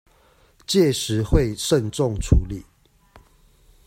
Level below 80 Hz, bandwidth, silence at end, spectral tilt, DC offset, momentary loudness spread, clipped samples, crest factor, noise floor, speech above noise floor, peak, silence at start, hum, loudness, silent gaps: -30 dBFS; 16 kHz; 0.7 s; -5.5 dB/octave; under 0.1%; 13 LU; under 0.1%; 20 dB; -57 dBFS; 37 dB; -2 dBFS; 0.7 s; none; -21 LUFS; none